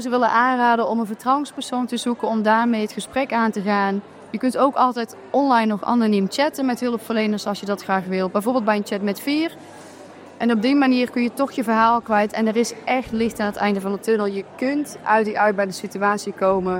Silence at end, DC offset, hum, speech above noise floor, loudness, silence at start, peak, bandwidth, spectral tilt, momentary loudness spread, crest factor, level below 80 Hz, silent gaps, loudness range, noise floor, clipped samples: 0 s; under 0.1%; none; 21 dB; -21 LUFS; 0 s; -4 dBFS; 16.5 kHz; -5 dB/octave; 8 LU; 16 dB; -60 dBFS; none; 2 LU; -41 dBFS; under 0.1%